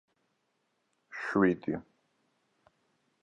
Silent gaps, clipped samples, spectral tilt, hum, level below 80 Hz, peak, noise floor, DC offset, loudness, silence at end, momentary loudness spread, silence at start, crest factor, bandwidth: none; under 0.1%; -8 dB/octave; none; -68 dBFS; -12 dBFS; -78 dBFS; under 0.1%; -31 LUFS; 1.4 s; 13 LU; 1.1 s; 24 dB; 9.2 kHz